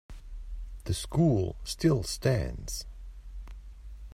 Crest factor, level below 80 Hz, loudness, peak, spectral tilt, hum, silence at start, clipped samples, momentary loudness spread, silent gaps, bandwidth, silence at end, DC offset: 18 dB; -42 dBFS; -29 LUFS; -12 dBFS; -6 dB/octave; none; 0.1 s; under 0.1%; 22 LU; none; 16 kHz; 0 s; under 0.1%